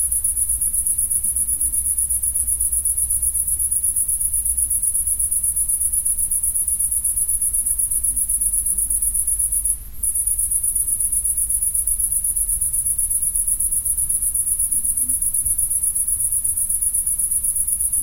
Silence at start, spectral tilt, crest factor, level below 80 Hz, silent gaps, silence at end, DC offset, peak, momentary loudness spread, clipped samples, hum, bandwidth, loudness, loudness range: 0 s; -1 dB/octave; 16 dB; -36 dBFS; none; 0 s; under 0.1%; -4 dBFS; 1 LU; under 0.1%; none; 16 kHz; -17 LUFS; 0 LU